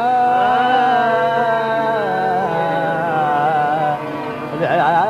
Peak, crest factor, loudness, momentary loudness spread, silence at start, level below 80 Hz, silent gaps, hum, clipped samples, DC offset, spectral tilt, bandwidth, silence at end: -4 dBFS; 12 dB; -17 LUFS; 7 LU; 0 s; -56 dBFS; none; none; under 0.1%; under 0.1%; -6.5 dB/octave; 12 kHz; 0 s